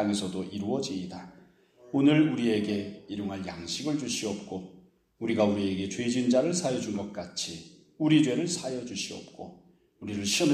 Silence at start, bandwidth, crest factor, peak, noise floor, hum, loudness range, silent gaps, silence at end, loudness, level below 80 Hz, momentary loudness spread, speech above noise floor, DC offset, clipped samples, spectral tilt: 0 s; 14.5 kHz; 18 dB; -10 dBFS; -57 dBFS; none; 3 LU; none; 0 s; -29 LUFS; -66 dBFS; 17 LU; 29 dB; under 0.1%; under 0.1%; -4.5 dB/octave